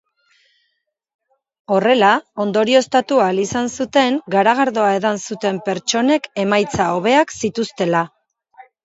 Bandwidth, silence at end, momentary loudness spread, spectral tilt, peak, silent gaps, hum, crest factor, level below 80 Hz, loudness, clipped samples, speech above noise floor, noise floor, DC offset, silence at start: 8 kHz; 0.2 s; 7 LU; -4 dB/octave; 0 dBFS; none; none; 18 dB; -56 dBFS; -17 LUFS; under 0.1%; 55 dB; -71 dBFS; under 0.1%; 1.7 s